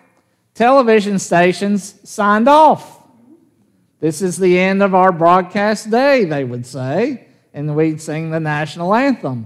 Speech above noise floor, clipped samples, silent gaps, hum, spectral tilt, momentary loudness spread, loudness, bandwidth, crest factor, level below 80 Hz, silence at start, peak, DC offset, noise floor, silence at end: 45 dB; under 0.1%; none; none; -6 dB/octave; 11 LU; -14 LUFS; 14 kHz; 14 dB; -64 dBFS; 0.6 s; 0 dBFS; under 0.1%; -59 dBFS; 0 s